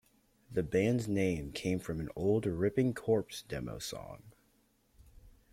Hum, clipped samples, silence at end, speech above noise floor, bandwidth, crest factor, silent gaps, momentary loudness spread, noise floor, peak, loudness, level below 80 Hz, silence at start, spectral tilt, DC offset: none; under 0.1%; 0.2 s; 38 dB; 16.5 kHz; 18 dB; none; 11 LU; -71 dBFS; -18 dBFS; -34 LUFS; -58 dBFS; 0.5 s; -6.5 dB/octave; under 0.1%